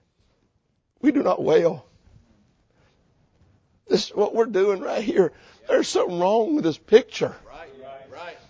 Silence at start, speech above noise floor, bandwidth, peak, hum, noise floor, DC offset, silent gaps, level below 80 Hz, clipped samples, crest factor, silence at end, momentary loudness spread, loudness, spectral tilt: 1.05 s; 49 dB; 8 kHz; -2 dBFS; none; -70 dBFS; under 0.1%; none; -62 dBFS; under 0.1%; 22 dB; 0.15 s; 23 LU; -22 LUFS; -5 dB/octave